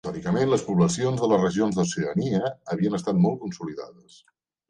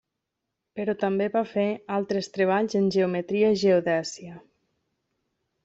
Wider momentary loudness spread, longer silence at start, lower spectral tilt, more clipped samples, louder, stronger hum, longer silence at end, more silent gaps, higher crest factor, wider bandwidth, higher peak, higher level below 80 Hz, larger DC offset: about the same, 12 LU vs 11 LU; second, 0.05 s vs 0.75 s; about the same, -6.5 dB/octave vs -6 dB/octave; neither; about the same, -24 LUFS vs -25 LUFS; neither; second, 0.8 s vs 1.25 s; neither; about the same, 16 dB vs 16 dB; first, 9.8 kHz vs 8 kHz; about the same, -10 dBFS vs -10 dBFS; first, -58 dBFS vs -68 dBFS; neither